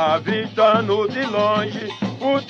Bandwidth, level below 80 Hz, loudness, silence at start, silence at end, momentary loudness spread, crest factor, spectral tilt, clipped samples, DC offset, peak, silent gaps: 7.6 kHz; -64 dBFS; -20 LUFS; 0 s; 0 s; 10 LU; 16 dB; -6 dB/octave; under 0.1%; under 0.1%; -4 dBFS; none